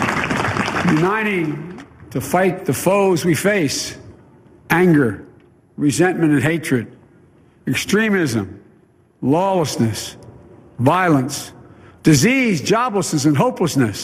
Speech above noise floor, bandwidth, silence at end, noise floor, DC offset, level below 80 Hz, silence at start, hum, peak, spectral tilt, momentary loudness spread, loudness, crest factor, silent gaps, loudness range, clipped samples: 36 dB; 15.5 kHz; 0 s; -53 dBFS; under 0.1%; -50 dBFS; 0 s; none; 0 dBFS; -5 dB/octave; 14 LU; -17 LUFS; 18 dB; none; 3 LU; under 0.1%